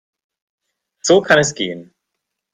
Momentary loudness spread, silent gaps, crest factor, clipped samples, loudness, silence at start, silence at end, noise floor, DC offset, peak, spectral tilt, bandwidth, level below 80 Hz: 13 LU; none; 18 dB; under 0.1%; -15 LUFS; 1.05 s; 0.7 s; -78 dBFS; under 0.1%; 0 dBFS; -3.5 dB/octave; 12 kHz; -58 dBFS